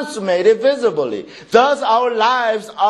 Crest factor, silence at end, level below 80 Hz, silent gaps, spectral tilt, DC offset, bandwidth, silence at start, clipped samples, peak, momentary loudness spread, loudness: 16 dB; 0 s; -64 dBFS; none; -4 dB/octave; under 0.1%; 12 kHz; 0 s; under 0.1%; 0 dBFS; 8 LU; -15 LUFS